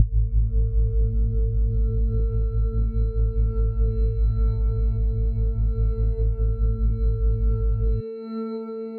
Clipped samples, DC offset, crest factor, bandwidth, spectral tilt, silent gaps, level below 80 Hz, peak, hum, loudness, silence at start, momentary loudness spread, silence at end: under 0.1%; under 0.1%; 16 dB; 1.4 kHz; -13.5 dB/octave; none; -22 dBFS; -4 dBFS; none; -25 LUFS; 0 s; 2 LU; 0 s